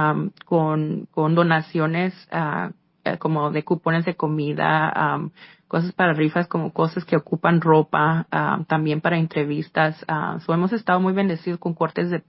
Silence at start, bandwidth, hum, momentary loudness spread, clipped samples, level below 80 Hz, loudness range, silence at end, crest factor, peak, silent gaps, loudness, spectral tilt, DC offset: 0 s; 5.8 kHz; none; 7 LU; under 0.1%; -64 dBFS; 2 LU; 0.1 s; 18 dB; -4 dBFS; none; -22 LUFS; -12 dB/octave; under 0.1%